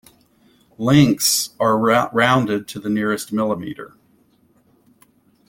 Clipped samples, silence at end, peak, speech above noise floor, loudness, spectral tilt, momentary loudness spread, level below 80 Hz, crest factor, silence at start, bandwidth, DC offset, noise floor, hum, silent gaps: under 0.1%; 1.6 s; -2 dBFS; 40 dB; -18 LUFS; -4.5 dB/octave; 11 LU; -54 dBFS; 18 dB; 0.8 s; 17 kHz; under 0.1%; -58 dBFS; none; none